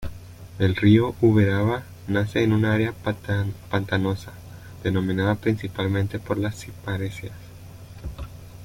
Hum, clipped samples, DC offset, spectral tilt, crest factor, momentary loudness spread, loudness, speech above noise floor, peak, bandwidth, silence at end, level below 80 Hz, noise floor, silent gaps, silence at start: none; under 0.1%; under 0.1%; -7.5 dB/octave; 18 dB; 22 LU; -23 LUFS; 19 dB; -4 dBFS; 16 kHz; 0 s; -46 dBFS; -42 dBFS; none; 0 s